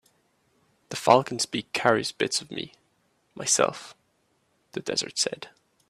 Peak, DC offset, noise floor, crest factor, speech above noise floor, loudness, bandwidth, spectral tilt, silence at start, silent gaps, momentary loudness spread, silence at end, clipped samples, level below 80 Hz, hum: -4 dBFS; under 0.1%; -70 dBFS; 26 dB; 44 dB; -25 LUFS; 15 kHz; -2.5 dB/octave; 0.9 s; none; 20 LU; 0.4 s; under 0.1%; -68 dBFS; none